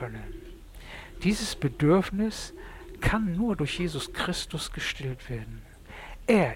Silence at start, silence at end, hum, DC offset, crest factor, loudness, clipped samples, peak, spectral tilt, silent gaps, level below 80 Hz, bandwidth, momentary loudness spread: 0 s; 0 s; none; under 0.1%; 18 dB; -29 LUFS; under 0.1%; -12 dBFS; -5.5 dB/octave; none; -42 dBFS; 16.5 kHz; 21 LU